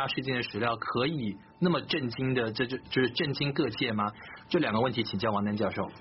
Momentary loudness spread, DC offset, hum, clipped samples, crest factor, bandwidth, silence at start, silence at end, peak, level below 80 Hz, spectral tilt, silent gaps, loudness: 4 LU; under 0.1%; none; under 0.1%; 16 dB; 6 kHz; 0 s; 0 s; -14 dBFS; -62 dBFS; -4 dB/octave; none; -30 LUFS